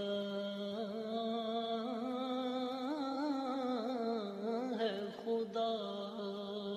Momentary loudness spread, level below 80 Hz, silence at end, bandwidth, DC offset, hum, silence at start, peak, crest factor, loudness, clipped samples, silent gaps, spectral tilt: 4 LU; -86 dBFS; 0 s; 13.5 kHz; under 0.1%; none; 0 s; -24 dBFS; 14 dB; -39 LUFS; under 0.1%; none; -6 dB/octave